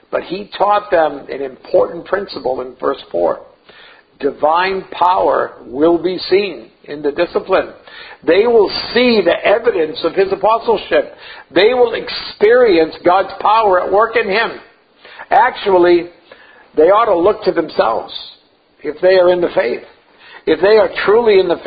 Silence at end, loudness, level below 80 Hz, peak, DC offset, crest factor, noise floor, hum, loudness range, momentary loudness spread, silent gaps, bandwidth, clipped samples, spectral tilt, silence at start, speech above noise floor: 0 s; -14 LUFS; -50 dBFS; 0 dBFS; under 0.1%; 14 dB; -43 dBFS; none; 4 LU; 14 LU; none; 5 kHz; under 0.1%; -8 dB/octave; 0.1 s; 29 dB